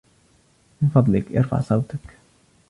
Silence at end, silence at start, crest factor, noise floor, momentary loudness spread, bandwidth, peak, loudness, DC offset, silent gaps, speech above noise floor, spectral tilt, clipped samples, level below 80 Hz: 0.6 s; 0.8 s; 20 dB; -59 dBFS; 11 LU; 11 kHz; -4 dBFS; -21 LUFS; under 0.1%; none; 39 dB; -10 dB/octave; under 0.1%; -48 dBFS